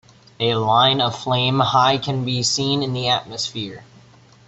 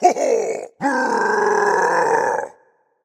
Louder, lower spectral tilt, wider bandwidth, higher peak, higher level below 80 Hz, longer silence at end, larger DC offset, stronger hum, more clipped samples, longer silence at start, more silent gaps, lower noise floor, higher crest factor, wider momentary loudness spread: about the same, -19 LUFS vs -18 LUFS; about the same, -4 dB/octave vs -3.5 dB/octave; second, 8.2 kHz vs 15 kHz; second, -4 dBFS vs 0 dBFS; first, -56 dBFS vs -72 dBFS; about the same, 0.65 s vs 0.55 s; neither; neither; neither; first, 0.4 s vs 0 s; neither; second, -49 dBFS vs -58 dBFS; about the same, 18 dB vs 18 dB; about the same, 10 LU vs 8 LU